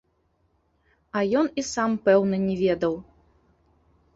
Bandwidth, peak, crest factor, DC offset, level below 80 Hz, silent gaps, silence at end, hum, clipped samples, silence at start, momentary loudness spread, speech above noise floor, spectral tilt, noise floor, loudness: 8 kHz; -6 dBFS; 20 dB; under 0.1%; -58 dBFS; none; 1.15 s; none; under 0.1%; 1.15 s; 8 LU; 46 dB; -5.5 dB/octave; -69 dBFS; -24 LUFS